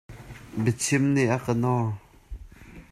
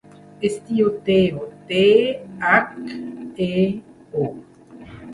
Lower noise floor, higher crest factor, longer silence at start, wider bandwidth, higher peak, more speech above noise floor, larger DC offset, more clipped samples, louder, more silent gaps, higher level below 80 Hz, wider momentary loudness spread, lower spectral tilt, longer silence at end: first, -46 dBFS vs -41 dBFS; about the same, 16 dB vs 20 dB; second, 0.1 s vs 0.4 s; first, 14 kHz vs 11.5 kHz; second, -10 dBFS vs -2 dBFS; about the same, 22 dB vs 22 dB; neither; neither; second, -25 LUFS vs -20 LUFS; neither; first, -48 dBFS vs -54 dBFS; first, 23 LU vs 17 LU; about the same, -5.5 dB/octave vs -6.5 dB/octave; about the same, 0.1 s vs 0 s